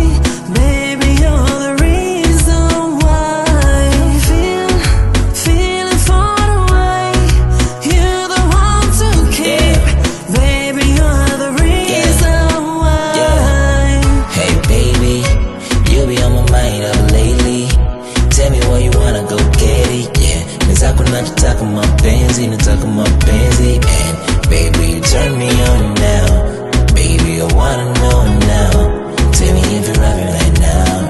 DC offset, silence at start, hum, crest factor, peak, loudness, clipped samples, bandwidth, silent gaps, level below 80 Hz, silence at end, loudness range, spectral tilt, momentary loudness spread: under 0.1%; 0 s; none; 10 dB; 0 dBFS; -12 LUFS; under 0.1%; 12.5 kHz; none; -12 dBFS; 0 s; 1 LU; -5 dB/octave; 3 LU